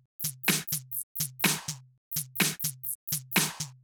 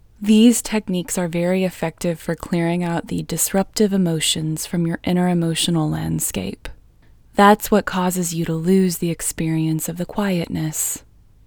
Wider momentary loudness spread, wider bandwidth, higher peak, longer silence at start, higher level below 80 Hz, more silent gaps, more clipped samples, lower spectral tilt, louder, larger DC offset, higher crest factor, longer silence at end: about the same, 8 LU vs 10 LU; about the same, over 20 kHz vs over 20 kHz; second, -10 dBFS vs 0 dBFS; about the same, 0.2 s vs 0.2 s; second, -70 dBFS vs -46 dBFS; first, 1.03-1.15 s, 1.98-2.11 s, 2.95-3.07 s vs none; neither; second, -2 dB/octave vs -5 dB/octave; second, -29 LUFS vs -19 LUFS; neither; about the same, 22 dB vs 20 dB; second, 0.05 s vs 0.45 s